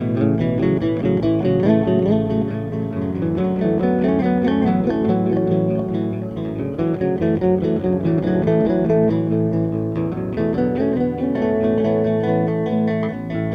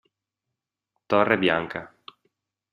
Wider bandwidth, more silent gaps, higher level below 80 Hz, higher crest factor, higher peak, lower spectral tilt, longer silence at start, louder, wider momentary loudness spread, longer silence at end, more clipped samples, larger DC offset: second, 6 kHz vs 15 kHz; neither; first, -44 dBFS vs -64 dBFS; second, 16 dB vs 24 dB; about the same, -2 dBFS vs -2 dBFS; first, -10.5 dB/octave vs -7 dB/octave; second, 0 s vs 1.1 s; first, -19 LUFS vs -23 LUFS; second, 6 LU vs 14 LU; second, 0 s vs 0.85 s; neither; neither